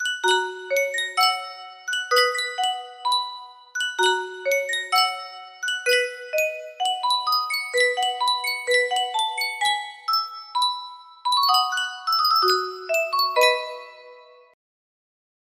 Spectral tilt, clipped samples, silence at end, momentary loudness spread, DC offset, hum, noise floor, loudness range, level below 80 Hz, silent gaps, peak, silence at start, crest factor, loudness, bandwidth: 1.5 dB/octave; under 0.1%; 1.3 s; 11 LU; under 0.1%; none; -48 dBFS; 3 LU; -76 dBFS; none; -6 dBFS; 0 s; 18 dB; -22 LUFS; 16 kHz